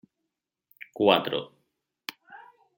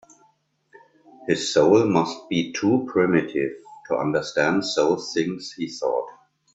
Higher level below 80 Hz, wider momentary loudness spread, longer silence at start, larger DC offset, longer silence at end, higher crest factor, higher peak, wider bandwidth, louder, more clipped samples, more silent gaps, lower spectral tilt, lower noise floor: second, -74 dBFS vs -62 dBFS; first, 24 LU vs 12 LU; second, 1 s vs 1.2 s; neither; about the same, 0.4 s vs 0.45 s; first, 26 dB vs 20 dB; about the same, -4 dBFS vs -4 dBFS; first, 16.5 kHz vs 8.2 kHz; second, -25 LUFS vs -22 LUFS; neither; neither; about the same, -5.5 dB/octave vs -5 dB/octave; first, -85 dBFS vs -64 dBFS